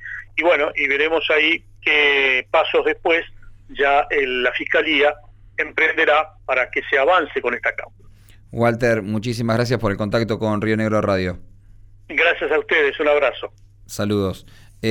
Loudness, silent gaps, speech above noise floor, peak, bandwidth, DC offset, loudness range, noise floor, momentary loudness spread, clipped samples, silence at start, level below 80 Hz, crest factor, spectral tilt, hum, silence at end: -18 LUFS; none; 26 dB; -6 dBFS; 16 kHz; under 0.1%; 4 LU; -45 dBFS; 11 LU; under 0.1%; 0 s; -46 dBFS; 14 dB; -5.5 dB/octave; none; 0 s